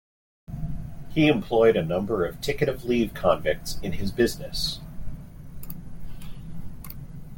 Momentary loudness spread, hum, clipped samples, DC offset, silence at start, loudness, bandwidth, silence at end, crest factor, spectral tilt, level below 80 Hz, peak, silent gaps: 21 LU; none; under 0.1%; under 0.1%; 0.5 s; -25 LUFS; 17 kHz; 0 s; 20 dB; -5.5 dB/octave; -40 dBFS; -6 dBFS; none